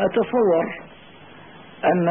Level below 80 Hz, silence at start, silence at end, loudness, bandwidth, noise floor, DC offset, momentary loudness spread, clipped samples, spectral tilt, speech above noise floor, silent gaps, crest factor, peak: -60 dBFS; 0 s; 0 s; -21 LUFS; 3.7 kHz; -45 dBFS; 0.2%; 11 LU; under 0.1%; -11.5 dB/octave; 26 dB; none; 12 dB; -10 dBFS